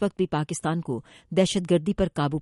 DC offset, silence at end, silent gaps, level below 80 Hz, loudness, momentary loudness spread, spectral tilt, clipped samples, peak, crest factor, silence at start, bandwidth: under 0.1%; 0 s; none; -46 dBFS; -26 LUFS; 7 LU; -6 dB/octave; under 0.1%; -8 dBFS; 18 dB; 0 s; 11.5 kHz